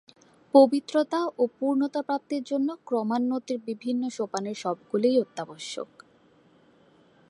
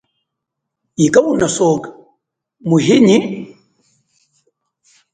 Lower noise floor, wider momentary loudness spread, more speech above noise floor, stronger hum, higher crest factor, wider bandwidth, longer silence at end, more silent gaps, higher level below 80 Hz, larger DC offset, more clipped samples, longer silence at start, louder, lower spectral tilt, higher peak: second, -60 dBFS vs -78 dBFS; second, 14 LU vs 20 LU; second, 34 dB vs 66 dB; neither; about the same, 20 dB vs 16 dB; first, 11 kHz vs 9.6 kHz; second, 1.45 s vs 1.65 s; neither; second, -82 dBFS vs -54 dBFS; neither; neither; second, 0.55 s vs 1 s; second, -26 LUFS vs -13 LUFS; about the same, -5.5 dB/octave vs -5.5 dB/octave; second, -6 dBFS vs 0 dBFS